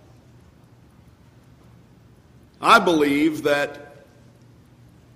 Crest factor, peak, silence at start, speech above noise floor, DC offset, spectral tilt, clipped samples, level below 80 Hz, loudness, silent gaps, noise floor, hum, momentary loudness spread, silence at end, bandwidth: 22 dB; -2 dBFS; 2.6 s; 33 dB; under 0.1%; -4.5 dB/octave; under 0.1%; -60 dBFS; -19 LUFS; none; -51 dBFS; none; 12 LU; 1.3 s; 15.5 kHz